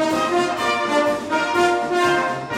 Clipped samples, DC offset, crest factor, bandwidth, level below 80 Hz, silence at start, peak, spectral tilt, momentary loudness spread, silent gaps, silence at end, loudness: under 0.1%; under 0.1%; 14 dB; 15.5 kHz; -56 dBFS; 0 s; -6 dBFS; -4 dB/octave; 2 LU; none; 0 s; -19 LUFS